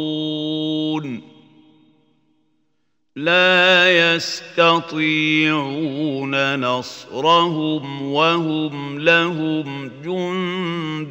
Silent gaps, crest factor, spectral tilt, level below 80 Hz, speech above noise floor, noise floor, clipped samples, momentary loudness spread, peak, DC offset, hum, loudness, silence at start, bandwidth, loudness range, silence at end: none; 20 dB; -5 dB/octave; -70 dBFS; 54 dB; -72 dBFS; under 0.1%; 13 LU; 0 dBFS; under 0.1%; none; -18 LUFS; 0 s; 16 kHz; 5 LU; 0 s